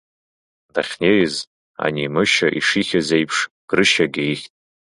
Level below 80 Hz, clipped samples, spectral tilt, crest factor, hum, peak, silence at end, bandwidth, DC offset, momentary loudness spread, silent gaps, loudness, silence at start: -56 dBFS; under 0.1%; -4 dB/octave; 20 dB; none; 0 dBFS; 0.4 s; 11.5 kHz; under 0.1%; 10 LU; 1.47-1.74 s, 3.51-3.68 s; -18 LUFS; 0.75 s